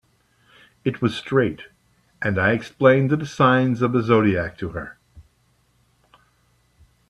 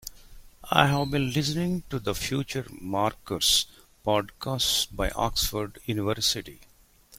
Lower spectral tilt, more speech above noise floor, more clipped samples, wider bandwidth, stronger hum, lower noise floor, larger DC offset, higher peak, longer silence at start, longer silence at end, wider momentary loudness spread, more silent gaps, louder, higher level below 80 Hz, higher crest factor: first, -7.5 dB/octave vs -3.5 dB/octave; first, 43 dB vs 21 dB; neither; second, 11 kHz vs 16.5 kHz; neither; first, -63 dBFS vs -48 dBFS; neither; about the same, -2 dBFS vs -2 dBFS; first, 0.85 s vs 0.05 s; first, 1.9 s vs 0.55 s; first, 14 LU vs 11 LU; neither; first, -20 LUFS vs -26 LUFS; second, -54 dBFS vs -44 dBFS; second, 20 dB vs 26 dB